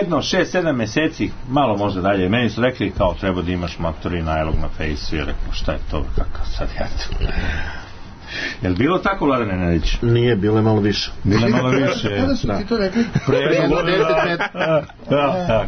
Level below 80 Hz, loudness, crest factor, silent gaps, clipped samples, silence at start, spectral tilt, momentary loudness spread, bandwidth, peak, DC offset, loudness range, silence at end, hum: -28 dBFS; -19 LUFS; 14 dB; none; under 0.1%; 0 s; -6.5 dB/octave; 10 LU; 6.6 kHz; -4 dBFS; under 0.1%; 8 LU; 0 s; none